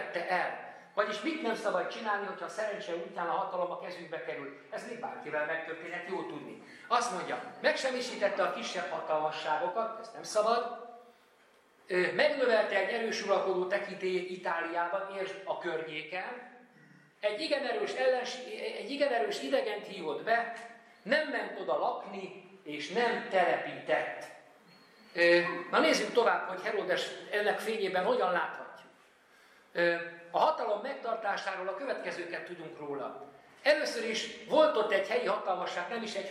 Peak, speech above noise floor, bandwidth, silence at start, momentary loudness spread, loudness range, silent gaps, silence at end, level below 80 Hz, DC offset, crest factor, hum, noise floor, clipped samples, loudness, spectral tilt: -14 dBFS; 32 dB; 14 kHz; 0 s; 13 LU; 6 LU; none; 0 s; -88 dBFS; under 0.1%; 20 dB; none; -64 dBFS; under 0.1%; -32 LUFS; -3.5 dB/octave